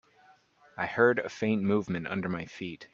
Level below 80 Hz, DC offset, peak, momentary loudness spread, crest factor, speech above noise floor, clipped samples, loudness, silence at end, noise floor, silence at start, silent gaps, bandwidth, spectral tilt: -66 dBFS; under 0.1%; -10 dBFS; 14 LU; 20 dB; 32 dB; under 0.1%; -30 LUFS; 0.1 s; -62 dBFS; 0.75 s; none; 7.4 kHz; -7 dB/octave